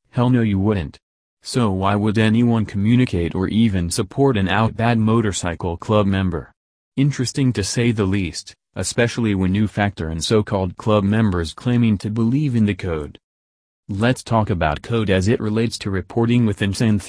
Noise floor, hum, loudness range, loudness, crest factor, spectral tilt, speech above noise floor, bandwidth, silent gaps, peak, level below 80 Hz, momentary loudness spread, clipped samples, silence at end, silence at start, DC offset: under -90 dBFS; none; 3 LU; -19 LUFS; 16 dB; -6 dB/octave; over 72 dB; 11 kHz; 1.02-1.37 s, 6.57-6.92 s, 13.24-13.83 s; -2 dBFS; -42 dBFS; 8 LU; under 0.1%; 0 s; 0.15 s; under 0.1%